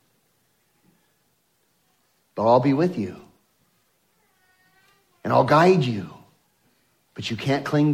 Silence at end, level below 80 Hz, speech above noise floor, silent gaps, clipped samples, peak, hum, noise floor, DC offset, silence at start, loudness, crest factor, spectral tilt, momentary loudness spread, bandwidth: 0 s; -66 dBFS; 48 dB; none; under 0.1%; -4 dBFS; none; -68 dBFS; under 0.1%; 2.35 s; -21 LUFS; 20 dB; -7 dB/octave; 19 LU; 14.5 kHz